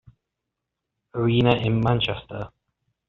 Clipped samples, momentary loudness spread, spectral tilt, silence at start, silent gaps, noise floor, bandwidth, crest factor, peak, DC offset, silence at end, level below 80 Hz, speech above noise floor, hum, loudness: under 0.1%; 16 LU; -5.5 dB/octave; 1.15 s; none; -83 dBFS; 5.4 kHz; 22 dB; -4 dBFS; under 0.1%; 0.6 s; -50 dBFS; 61 dB; none; -22 LUFS